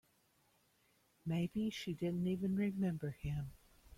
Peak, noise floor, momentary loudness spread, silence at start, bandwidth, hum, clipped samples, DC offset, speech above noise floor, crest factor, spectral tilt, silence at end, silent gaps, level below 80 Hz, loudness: -28 dBFS; -75 dBFS; 7 LU; 1.25 s; 15.5 kHz; none; under 0.1%; under 0.1%; 36 dB; 12 dB; -7.5 dB/octave; 0.05 s; none; -62 dBFS; -40 LUFS